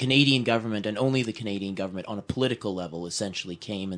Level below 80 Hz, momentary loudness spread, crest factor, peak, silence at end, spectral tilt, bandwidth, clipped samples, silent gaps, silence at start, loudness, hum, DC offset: -60 dBFS; 13 LU; 20 dB; -8 dBFS; 0 s; -5 dB/octave; 10 kHz; under 0.1%; none; 0 s; -27 LUFS; none; under 0.1%